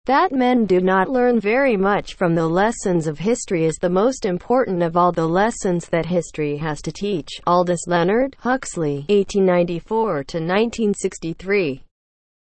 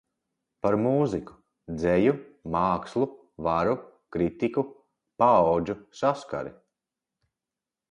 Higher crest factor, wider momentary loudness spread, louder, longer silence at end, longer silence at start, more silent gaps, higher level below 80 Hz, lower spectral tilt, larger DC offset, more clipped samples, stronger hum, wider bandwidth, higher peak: second, 14 dB vs 20 dB; second, 7 LU vs 13 LU; first, -19 LUFS vs -26 LUFS; second, 0.7 s vs 1.4 s; second, 0.05 s vs 0.65 s; neither; first, -46 dBFS vs -54 dBFS; second, -6 dB/octave vs -8 dB/octave; neither; neither; neither; second, 8.8 kHz vs 10 kHz; first, -4 dBFS vs -8 dBFS